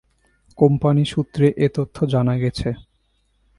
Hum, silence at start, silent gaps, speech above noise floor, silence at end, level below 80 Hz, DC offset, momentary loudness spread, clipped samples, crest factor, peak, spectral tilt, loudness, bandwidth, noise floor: none; 0.6 s; none; 47 dB; 0.75 s; -44 dBFS; under 0.1%; 8 LU; under 0.1%; 18 dB; -2 dBFS; -8 dB/octave; -19 LUFS; 11.5 kHz; -65 dBFS